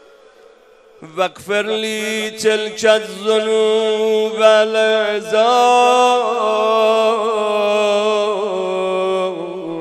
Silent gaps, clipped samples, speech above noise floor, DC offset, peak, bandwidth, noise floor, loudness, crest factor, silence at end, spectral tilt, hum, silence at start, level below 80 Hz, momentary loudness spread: none; under 0.1%; 32 dB; under 0.1%; 0 dBFS; 13.5 kHz; -47 dBFS; -16 LUFS; 16 dB; 0 s; -3 dB/octave; none; 1 s; -68 dBFS; 8 LU